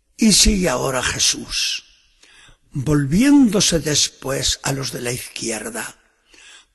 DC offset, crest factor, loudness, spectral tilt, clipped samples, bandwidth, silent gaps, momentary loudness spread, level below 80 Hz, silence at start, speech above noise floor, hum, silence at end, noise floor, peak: under 0.1%; 18 dB; -17 LUFS; -3 dB/octave; under 0.1%; 12.5 kHz; none; 14 LU; -34 dBFS; 0.2 s; 34 dB; none; 0.8 s; -52 dBFS; -2 dBFS